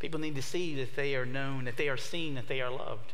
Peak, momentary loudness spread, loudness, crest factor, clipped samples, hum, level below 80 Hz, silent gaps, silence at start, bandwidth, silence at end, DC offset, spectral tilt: -16 dBFS; 3 LU; -35 LUFS; 16 dB; under 0.1%; none; -66 dBFS; none; 0 s; 16 kHz; 0 s; 3%; -5 dB/octave